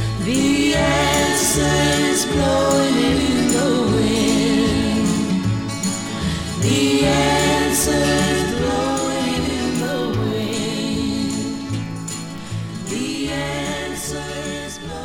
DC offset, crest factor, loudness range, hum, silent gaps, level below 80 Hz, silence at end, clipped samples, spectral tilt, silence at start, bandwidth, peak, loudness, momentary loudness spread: under 0.1%; 14 dB; 8 LU; none; none; -36 dBFS; 0 s; under 0.1%; -4 dB/octave; 0 s; 16.5 kHz; -4 dBFS; -19 LUFS; 10 LU